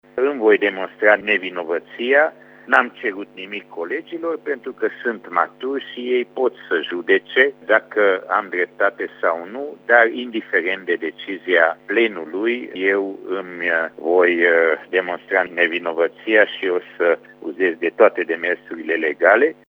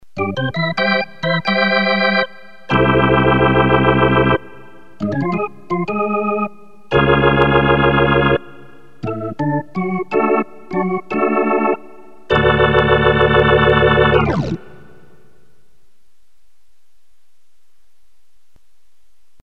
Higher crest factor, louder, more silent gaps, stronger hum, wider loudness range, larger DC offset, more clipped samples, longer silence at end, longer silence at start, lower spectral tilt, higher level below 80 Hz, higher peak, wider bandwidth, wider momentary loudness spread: about the same, 20 dB vs 16 dB; second, -19 LUFS vs -15 LUFS; neither; first, 50 Hz at -65 dBFS vs none; about the same, 5 LU vs 5 LU; second, under 0.1% vs 1%; neither; second, 0.15 s vs 4.85 s; first, 0.15 s vs 0 s; second, -6 dB/octave vs -8 dB/octave; second, -76 dBFS vs -34 dBFS; about the same, 0 dBFS vs 0 dBFS; second, 5.4 kHz vs 6.8 kHz; about the same, 11 LU vs 10 LU